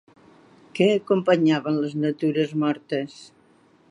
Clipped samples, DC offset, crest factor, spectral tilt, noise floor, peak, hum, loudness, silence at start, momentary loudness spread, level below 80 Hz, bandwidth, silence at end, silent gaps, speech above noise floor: under 0.1%; under 0.1%; 18 dB; -7 dB/octave; -57 dBFS; -6 dBFS; none; -23 LUFS; 0.75 s; 10 LU; -72 dBFS; 10.5 kHz; 0.65 s; none; 35 dB